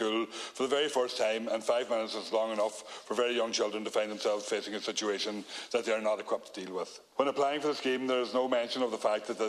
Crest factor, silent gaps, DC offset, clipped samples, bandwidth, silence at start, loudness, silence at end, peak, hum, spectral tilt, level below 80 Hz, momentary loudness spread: 18 dB; none; under 0.1%; under 0.1%; 13.5 kHz; 0 s; -32 LUFS; 0 s; -14 dBFS; none; -2.5 dB/octave; -82 dBFS; 7 LU